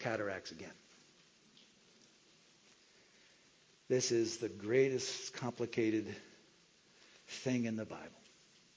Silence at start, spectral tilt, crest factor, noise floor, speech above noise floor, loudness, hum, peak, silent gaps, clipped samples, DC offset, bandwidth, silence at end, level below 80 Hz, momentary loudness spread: 0 s; -4.5 dB/octave; 22 dB; -68 dBFS; 30 dB; -37 LUFS; none; -18 dBFS; none; under 0.1%; under 0.1%; 8 kHz; 0.65 s; -78 dBFS; 19 LU